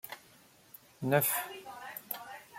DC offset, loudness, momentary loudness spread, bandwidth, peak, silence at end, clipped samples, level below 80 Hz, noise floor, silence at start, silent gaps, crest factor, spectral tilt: under 0.1%; -33 LUFS; 26 LU; 16.5 kHz; -12 dBFS; 0 s; under 0.1%; -78 dBFS; -61 dBFS; 0.05 s; none; 24 dB; -4 dB/octave